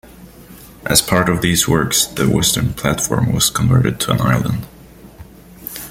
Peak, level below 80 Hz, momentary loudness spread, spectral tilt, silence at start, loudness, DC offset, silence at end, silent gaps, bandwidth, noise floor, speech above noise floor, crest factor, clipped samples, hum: 0 dBFS; -38 dBFS; 12 LU; -4 dB/octave; 0.05 s; -15 LUFS; under 0.1%; 0 s; none; 16.5 kHz; -39 dBFS; 24 dB; 18 dB; under 0.1%; none